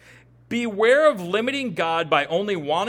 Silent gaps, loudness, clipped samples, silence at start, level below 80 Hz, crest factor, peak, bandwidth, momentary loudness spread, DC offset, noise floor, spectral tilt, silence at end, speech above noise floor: none; -21 LUFS; under 0.1%; 0.5 s; -62 dBFS; 18 dB; -4 dBFS; 17 kHz; 10 LU; under 0.1%; -51 dBFS; -4.5 dB/octave; 0 s; 30 dB